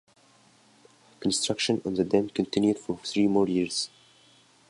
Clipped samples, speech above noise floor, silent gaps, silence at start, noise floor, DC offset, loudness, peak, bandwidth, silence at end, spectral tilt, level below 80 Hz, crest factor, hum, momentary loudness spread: under 0.1%; 34 dB; none; 1.2 s; -60 dBFS; under 0.1%; -27 LUFS; -8 dBFS; 11.5 kHz; 0.8 s; -4.5 dB/octave; -62 dBFS; 20 dB; none; 7 LU